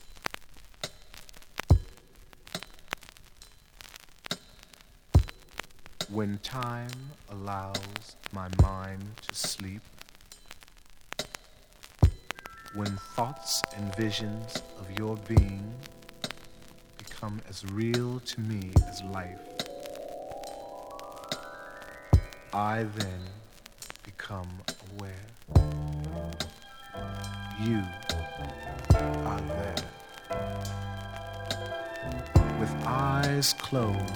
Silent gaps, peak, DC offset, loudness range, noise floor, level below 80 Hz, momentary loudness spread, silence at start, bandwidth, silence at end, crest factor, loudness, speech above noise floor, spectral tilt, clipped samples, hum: none; -8 dBFS; under 0.1%; 4 LU; -55 dBFS; -40 dBFS; 20 LU; 0 s; over 20 kHz; 0 s; 24 dB; -32 LUFS; 24 dB; -5 dB/octave; under 0.1%; none